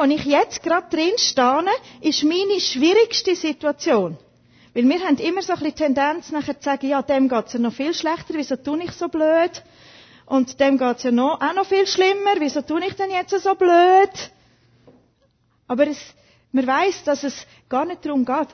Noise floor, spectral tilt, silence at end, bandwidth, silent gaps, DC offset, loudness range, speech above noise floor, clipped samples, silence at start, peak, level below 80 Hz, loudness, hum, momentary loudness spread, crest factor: -63 dBFS; -3.5 dB/octave; 0.05 s; 6.6 kHz; none; under 0.1%; 5 LU; 43 dB; under 0.1%; 0 s; -4 dBFS; -60 dBFS; -20 LUFS; none; 9 LU; 16 dB